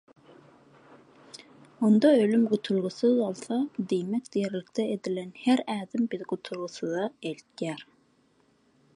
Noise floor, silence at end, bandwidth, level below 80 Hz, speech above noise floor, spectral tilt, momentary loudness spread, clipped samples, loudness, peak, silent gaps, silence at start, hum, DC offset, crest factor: -66 dBFS; 1.1 s; 11.5 kHz; -78 dBFS; 39 dB; -6.5 dB/octave; 15 LU; under 0.1%; -28 LUFS; -10 dBFS; none; 1.8 s; none; under 0.1%; 20 dB